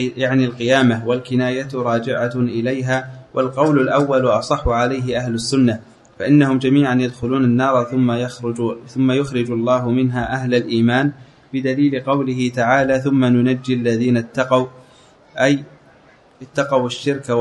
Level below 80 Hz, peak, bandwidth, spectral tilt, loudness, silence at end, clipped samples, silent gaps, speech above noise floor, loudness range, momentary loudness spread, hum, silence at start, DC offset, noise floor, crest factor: -44 dBFS; 0 dBFS; 11 kHz; -6.5 dB/octave; -18 LUFS; 0 s; under 0.1%; none; 32 dB; 2 LU; 7 LU; none; 0 s; under 0.1%; -49 dBFS; 16 dB